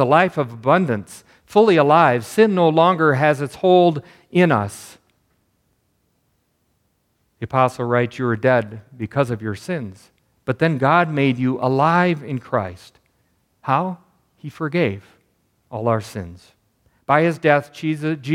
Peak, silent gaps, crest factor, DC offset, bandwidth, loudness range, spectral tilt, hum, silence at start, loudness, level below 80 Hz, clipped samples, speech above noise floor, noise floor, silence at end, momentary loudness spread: 0 dBFS; none; 20 dB; under 0.1%; 15 kHz; 10 LU; -7 dB/octave; none; 0 s; -18 LUFS; -62 dBFS; under 0.1%; 49 dB; -67 dBFS; 0 s; 18 LU